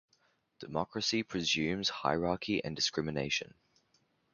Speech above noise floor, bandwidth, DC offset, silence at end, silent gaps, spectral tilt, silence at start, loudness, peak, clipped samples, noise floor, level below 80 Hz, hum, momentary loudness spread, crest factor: 40 dB; 7.4 kHz; under 0.1%; 0.85 s; none; -3.5 dB/octave; 0.6 s; -33 LUFS; -14 dBFS; under 0.1%; -74 dBFS; -62 dBFS; none; 7 LU; 22 dB